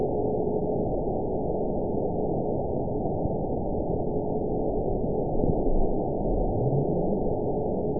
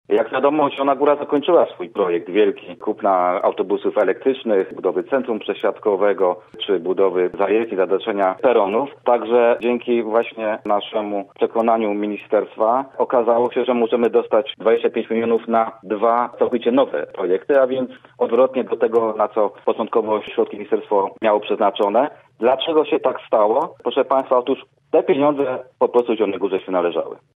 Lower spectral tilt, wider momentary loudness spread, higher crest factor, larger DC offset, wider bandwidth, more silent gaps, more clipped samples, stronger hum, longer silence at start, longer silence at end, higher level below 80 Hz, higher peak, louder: first, -18.5 dB/octave vs -7.5 dB/octave; second, 3 LU vs 6 LU; about the same, 16 dB vs 16 dB; first, 2% vs under 0.1%; second, 1 kHz vs 3.9 kHz; neither; neither; neither; about the same, 0 s vs 0.1 s; second, 0 s vs 0.2 s; first, -34 dBFS vs -70 dBFS; second, -10 dBFS vs -4 dBFS; second, -28 LUFS vs -19 LUFS